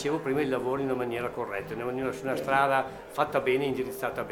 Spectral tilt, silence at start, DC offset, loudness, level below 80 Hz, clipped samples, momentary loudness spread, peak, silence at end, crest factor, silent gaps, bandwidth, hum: -5.5 dB/octave; 0 s; under 0.1%; -29 LUFS; -60 dBFS; under 0.1%; 8 LU; -10 dBFS; 0 s; 20 dB; none; 18 kHz; none